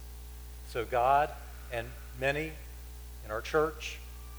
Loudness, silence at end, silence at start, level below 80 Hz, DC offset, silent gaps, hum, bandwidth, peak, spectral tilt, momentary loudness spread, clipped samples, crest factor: -32 LUFS; 0 s; 0 s; -46 dBFS; under 0.1%; none; 60 Hz at -45 dBFS; over 20 kHz; -14 dBFS; -4.5 dB/octave; 20 LU; under 0.1%; 20 dB